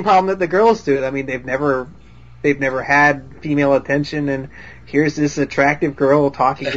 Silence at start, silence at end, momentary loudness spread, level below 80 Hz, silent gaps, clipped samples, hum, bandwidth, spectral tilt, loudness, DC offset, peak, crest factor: 0 s; 0 s; 9 LU; -46 dBFS; none; under 0.1%; none; 7.8 kHz; -6 dB/octave; -17 LUFS; 0.6%; -2 dBFS; 16 dB